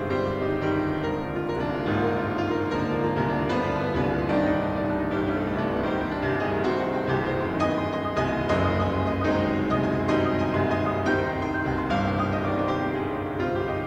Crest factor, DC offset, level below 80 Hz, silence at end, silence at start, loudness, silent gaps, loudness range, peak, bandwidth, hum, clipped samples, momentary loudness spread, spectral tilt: 14 dB; under 0.1%; -44 dBFS; 0 s; 0 s; -25 LUFS; none; 2 LU; -12 dBFS; 8.8 kHz; none; under 0.1%; 3 LU; -7.5 dB/octave